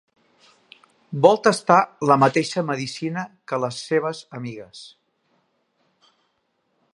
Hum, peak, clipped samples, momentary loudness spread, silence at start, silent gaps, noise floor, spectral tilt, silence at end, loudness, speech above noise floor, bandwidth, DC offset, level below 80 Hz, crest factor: none; 0 dBFS; under 0.1%; 18 LU; 1.1 s; none; -71 dBFS; -5.5 dB/octave; 2.05 s; -20 LUFS; 50 dB; 11.5 kHz; under 0.1%; -70 dBFS; 22 dB